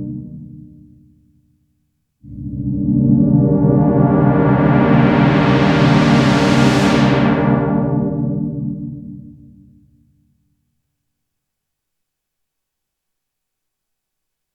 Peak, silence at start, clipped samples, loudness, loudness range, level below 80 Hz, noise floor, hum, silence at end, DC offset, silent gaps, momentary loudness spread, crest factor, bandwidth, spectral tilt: 0 dBFS; 0 s; under 0.1%; -14 LUFS; 13 LU; -38 dBFS; -78 dBFS; none; 5.3 s; under 0.1%; none; 16 LU; 16 dB; 10.5 kHz; -7.5 dB/octave